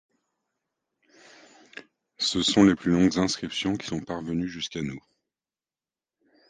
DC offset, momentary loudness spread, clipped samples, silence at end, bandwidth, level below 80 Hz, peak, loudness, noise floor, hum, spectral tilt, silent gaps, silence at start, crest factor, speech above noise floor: under 0.1%; 25 LU; under 0.1%; 1.5 s; 9.6 kHz; -54 dBFS; -6 dBFS; -25 LUFS; under -90 dBFS; none; -4.5 dB/octave; none; 1.75 s; 22 dB; over 65 dB